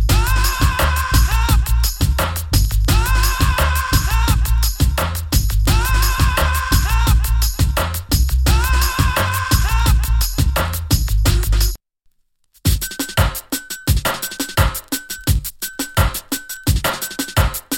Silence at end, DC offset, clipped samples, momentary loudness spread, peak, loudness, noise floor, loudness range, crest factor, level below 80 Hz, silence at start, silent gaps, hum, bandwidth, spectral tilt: 0 s; under 0.1%; under 0.1%; 5 LU; -2 dBFS; -18 LUFS; -59 dBFS; 4 LU; 14 dB; -18 dBFS; 0 s; none; none; 17.5 kHz; -4 dB/octave